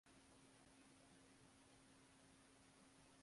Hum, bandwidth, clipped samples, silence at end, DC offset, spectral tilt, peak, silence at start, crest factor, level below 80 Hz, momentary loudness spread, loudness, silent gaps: none; 11.5 kHz; under 0.1%; 0 s; under 0.1%; -3.5 dB/octave; -56 dBFS; 0.05 s; 14 dB; -84 dBFS; 1 LU; -69 LUFS; none